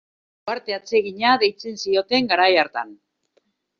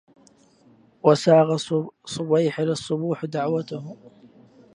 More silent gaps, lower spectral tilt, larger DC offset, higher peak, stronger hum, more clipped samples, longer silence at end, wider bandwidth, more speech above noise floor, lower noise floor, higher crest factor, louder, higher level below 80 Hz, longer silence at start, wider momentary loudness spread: neither; second, 0 dB/octave vs -6.5 dB/octave; neither; about the same, -4 dBFS vs -2 dBFS; neither; neither; first, 0.85 s vs 0.65 s; second, 7.2 kHz vs 11 kHz; first, 47 dB vs 34 dB; first, -67 dBFS vs -56 dBFS; about the same, 18 dB vs 22 dB; about the same, -20 LUFS vs -22 LUFS; about the same, -68 dBFS vs -68 dBFS; second, 0.45 s vs 1.05 s; second, 13 LU vs 16 LU